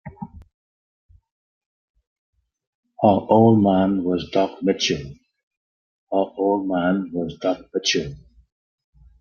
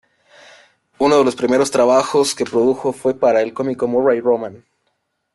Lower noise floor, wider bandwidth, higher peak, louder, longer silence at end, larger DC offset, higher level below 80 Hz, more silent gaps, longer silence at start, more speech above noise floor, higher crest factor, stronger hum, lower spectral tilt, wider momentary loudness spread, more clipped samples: first, under -90 dBFS vs -70 dBFS; second, 7.2 kHz vs 12.5 kHz; about the same, -2 dBFS vs -2 dBFS; second, -20 LUFS vs -16 LUFS; first, 1.05 s vs 0.8 s; neither; first, -54 dBFS vs -60 dBFS; first, 0.54-1.09 s, 1.32-1.94 s, 2.07-2.33 s, 2.67-2.83 s, 5.43-5.51 s, 5.57-6.07 s vs none; second, 0.05 s vs 1 s; first, over 70 dB vs 54 dB; first, 20 dB vs 14 dB; neither; about the same, -5.5 dB/octave vs -4.5 dB/octave; first, 14 LU vs 6 LU; neither